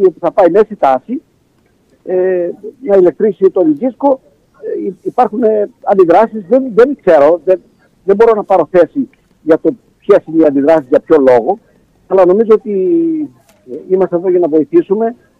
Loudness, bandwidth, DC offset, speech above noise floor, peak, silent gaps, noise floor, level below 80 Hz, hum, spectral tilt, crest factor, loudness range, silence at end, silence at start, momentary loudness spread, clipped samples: -11 LUFS; 6.6 kHz; under 0.1%; 43 dB; 0 dBFS; none; -53 dBFS; -52 dBFS; none; -8.5 dB/octave; 12 dB; 3 LU; 0.25 s; 0 s; 12 LU; under 0.1%